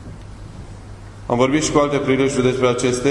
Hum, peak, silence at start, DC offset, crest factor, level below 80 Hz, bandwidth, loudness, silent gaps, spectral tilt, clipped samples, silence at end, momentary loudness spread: none; -2 dBFS; 0 s; under 0.1%; 18 dB; -40 dBFS; 12 kHz; -17 LUFS; none; -5 dB/octave; under 0.1%; 0 s; 21 LU